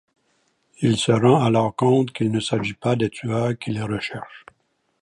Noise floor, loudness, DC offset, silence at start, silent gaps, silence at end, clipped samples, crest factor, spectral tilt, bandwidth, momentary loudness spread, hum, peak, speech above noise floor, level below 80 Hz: -67 dBFS; -21 LUFS; under 0.1%; 0.8 s; none; 0.65 s; under 0.1%; 18 dB; -6.5 dB/octave; 11.5 kHz; 11 LU; none; -2 dBFS; 46 dB; -56 dBFS